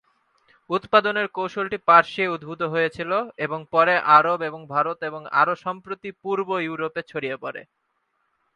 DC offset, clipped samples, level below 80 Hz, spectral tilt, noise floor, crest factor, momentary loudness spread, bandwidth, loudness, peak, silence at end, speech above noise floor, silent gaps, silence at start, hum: under 0.1%; under 0.1%; -68 dBFS; -6 dB/octave; -72 dBFS; 22 dB; 15 LU; 9.8 kHz; -22 LUFS; 0 dBFS; 0.95 s; 50 dB; none; 0.7 s; none